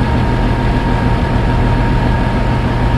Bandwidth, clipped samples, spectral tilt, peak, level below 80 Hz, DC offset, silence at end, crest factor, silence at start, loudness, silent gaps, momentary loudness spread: 11 kHz; under 0.1%; -8 dB/octave; 0 dBFS; -18 dBFS; 0.4%; 0 s; 12 dB; 0 s; -15 LUFS; none; 1 LU